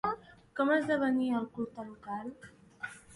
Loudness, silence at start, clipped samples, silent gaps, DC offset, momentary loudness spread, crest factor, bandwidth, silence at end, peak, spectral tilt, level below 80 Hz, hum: -33 LUFS; 0.05 s; under 0.1%; none; under 0.1%; 16 LU; 16 dB; 11.5 kHz; 0 s; -18 dBFS; -6 dB/octave; -68 dBFS; none